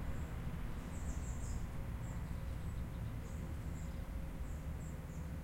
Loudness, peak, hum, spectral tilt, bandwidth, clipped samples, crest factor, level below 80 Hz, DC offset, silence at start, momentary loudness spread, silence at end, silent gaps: -46 LUFS; -28 dBFS; none; -6.5 dB/octave; 16.5 kHz; under 0.1%; 14 dB; -46 dBFS; under 0.1%; 0 s; 2 LU; 0 s; none